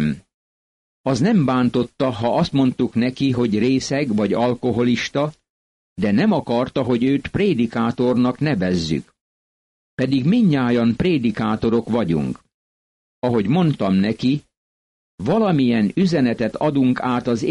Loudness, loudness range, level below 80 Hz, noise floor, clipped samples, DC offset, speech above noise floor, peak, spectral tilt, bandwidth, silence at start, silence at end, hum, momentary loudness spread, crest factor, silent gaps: -19 LUFS; 2 LU; -48 dBFS; under -90 dBFS; under 0.1%; under 0.1%; over 72 dB; -8 dBFS; -7 dB/octave; 10.5 kHz; 0 s; 0 s; none; 7 LU; 12 dB; 0.34-1.04 s, 5.50-5.96 s, 9.21-9.97 s, 12.54-13.22 s, 14.57-15.18 s